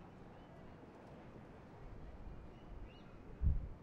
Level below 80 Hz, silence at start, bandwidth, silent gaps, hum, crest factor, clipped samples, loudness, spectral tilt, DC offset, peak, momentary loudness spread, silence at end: -48 dBFS; 0 s; 6 kHz; none; none; 22 dB; under 0.1%; -50 LUFS; -9 dB/octave; under 0.1%; -24 dBFS; 17 LU; 0 s